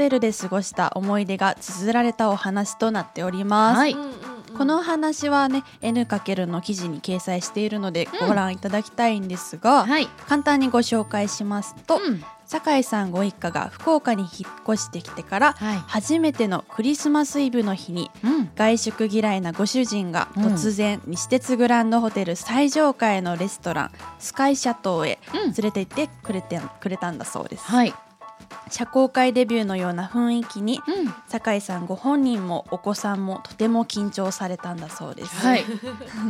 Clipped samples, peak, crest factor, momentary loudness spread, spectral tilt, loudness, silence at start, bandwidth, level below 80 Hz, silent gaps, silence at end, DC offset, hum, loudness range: under 0.1%; -4 dBFS; 18 dB; 11 LU; -4.5 dB/octave; -23 LUFS; 0 s; 15.5 kHz; -62 dBFS; none; 0 s; under 0.1%; none; 4 LU